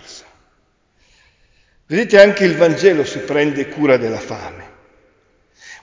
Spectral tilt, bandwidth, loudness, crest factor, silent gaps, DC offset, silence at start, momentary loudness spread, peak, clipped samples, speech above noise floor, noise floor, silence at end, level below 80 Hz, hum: -5.5 dB/octave; 7.6 kHz; -14 LUFS; 16 dB; none; under 0.1%; 0.1 s; 17 LU; 0 dBFS; under 0.1%; 46 dB; -60 dBFS; 0.05 s; -54 dBFS; none